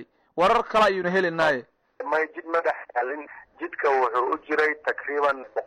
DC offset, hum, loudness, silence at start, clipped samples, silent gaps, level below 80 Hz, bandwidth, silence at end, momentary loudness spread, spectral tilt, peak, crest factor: under 0.1%; none; -24 LUFS; 0 s; under 0.1%; none; -58 dBFS; 12.5 kHz; 0 s; 14 LU; -5 dB/octave; -10 dBFS; 14 dB